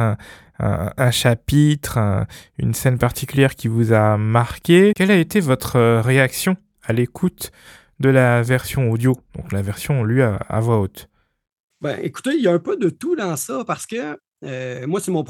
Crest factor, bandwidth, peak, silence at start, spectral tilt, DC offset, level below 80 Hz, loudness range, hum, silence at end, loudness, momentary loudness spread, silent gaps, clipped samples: 16 dB; 18.5 kHz; -2 dBFS; 0 s; -6 dB/octave; under 0.1%; -44 dBFS; 6 LU; none; 0.05 s; -19 LUFS; 12 LU; 11.52-11.68 s, 14.28-14.32 s; under 0.1%